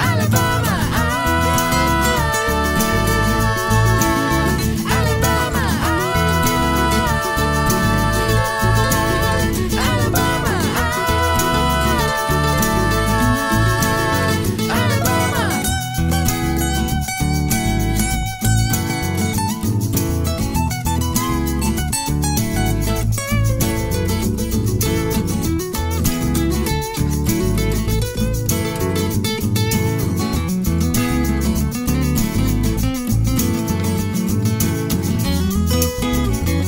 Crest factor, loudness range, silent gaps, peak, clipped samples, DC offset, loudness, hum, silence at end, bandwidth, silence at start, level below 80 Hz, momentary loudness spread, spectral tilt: 16 dB; 3 LU; none; -2 dBFS; under 0.1%; under 0.1%; -18 LUFS; none; 0 s; 16.5 kHz; 0 s; -26 dBFS; 4 LU; -5 dB/octave